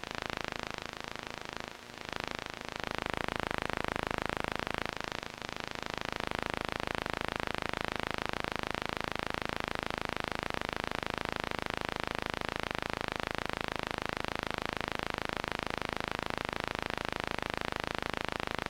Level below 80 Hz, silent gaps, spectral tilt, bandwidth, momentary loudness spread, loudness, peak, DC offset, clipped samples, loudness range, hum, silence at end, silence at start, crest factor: -52 dBFS; none; -4 dB/octave; 17 kHz; 4 LU; -37 LUFS; -12 dBFS; under 0.1%; under 0.1%; 1 LU; none; 0 s; 0 s; 26 dB